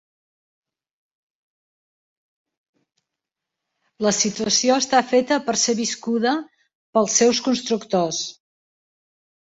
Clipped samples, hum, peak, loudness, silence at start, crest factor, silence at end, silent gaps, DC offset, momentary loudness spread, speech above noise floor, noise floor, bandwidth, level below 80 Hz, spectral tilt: under 0.1%; none; -2 dBFS; -20 LUFS; 4 s; 22 dB; 1.2 s; 6.75-6.93 s; under 0.1%; 7 LU; 65 dB; -85 dBFS; 8 kHz; -66 dBFS; -2.5 dB/octave